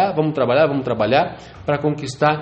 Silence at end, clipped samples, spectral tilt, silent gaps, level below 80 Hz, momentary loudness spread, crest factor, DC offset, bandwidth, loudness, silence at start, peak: 0 s; under 0.1%; -6.5 dB/octave; none; -50 dBFS; 7 LU; 18 dB; under 0.1%; 8.8 kHz; -19 LUFS; 0 s; 0 dBFS